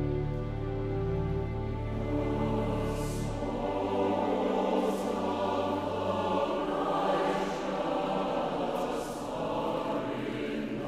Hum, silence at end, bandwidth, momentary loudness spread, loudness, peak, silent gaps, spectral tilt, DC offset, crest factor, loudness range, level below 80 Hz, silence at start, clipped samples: none; 0 s; 14.5 kHz; 5 LU; -32 LUFS; -16 dBFS; none; -7 dB/octave; under 0.1%; 14 dB; 2 LU; -44 dBFS; 0 s; under 0.1%